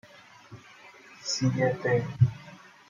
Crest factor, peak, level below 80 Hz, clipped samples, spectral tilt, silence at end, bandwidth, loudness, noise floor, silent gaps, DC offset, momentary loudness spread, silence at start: 20 dB; -10 dBFS; -60 dBFS; under 0.1%; -5.5 dB/octave; 0.35 s; 7.4 kHz; -27 LUFS; -52 dBFS; none; under 0.1%; 24 LU; 0.5 s